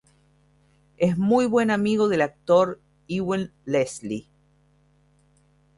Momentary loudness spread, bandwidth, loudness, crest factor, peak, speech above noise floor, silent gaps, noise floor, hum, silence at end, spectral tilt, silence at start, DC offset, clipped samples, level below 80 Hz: 12 LU; 11.5 kHz; -23 LUFS; 18 dB; -6 dBFS; 39 dB; none; -61 dBFS; none; 1.55 s; -6.5 dB/octave; 1 s; under 0.1%; under 0.1%; -60 dBFS